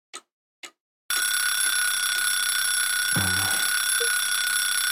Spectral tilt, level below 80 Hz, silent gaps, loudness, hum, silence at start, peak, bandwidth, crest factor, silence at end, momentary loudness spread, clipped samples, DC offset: 0.5 dB/octave; -68 dBFS; 0.32-0.63 s, 0.80-1.09 s; -22 LUFS; none; 0.15 s; -8 dBFS; 16.5 kHz; 16 dB; 0 s; 1 LU; under 0.1%; 0.2%